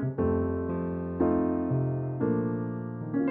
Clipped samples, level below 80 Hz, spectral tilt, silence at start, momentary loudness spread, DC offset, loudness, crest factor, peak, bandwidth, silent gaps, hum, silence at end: under 0.1%; -50 dBFS; -11.5 dB/octave; 0 s; 6 LU; under 0.1%; -29 LUFS; 14 dB; -14 dBFS; 3 kHz; none; none; 0 s